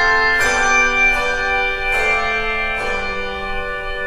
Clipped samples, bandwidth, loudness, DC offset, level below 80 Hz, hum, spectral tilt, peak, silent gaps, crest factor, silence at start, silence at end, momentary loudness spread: under 0.1%; 13.5 kHz; -16 LUFS; under 0.1%; -30 dBFS; none; -2 dB/octave; -4 dBFS; none; 14 dB; 0 s; 0 s; 10 LU